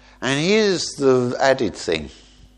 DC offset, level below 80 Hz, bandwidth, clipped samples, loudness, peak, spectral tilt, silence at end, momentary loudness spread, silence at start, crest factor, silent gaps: under 0.1%; -48 dBFS; 10.5 kHz; under 0.1%; -19 LUFS; -2 dBFS; -4.5 dB/octave; 0.45 s; 8 LU; 0.2 s; 18 dB; none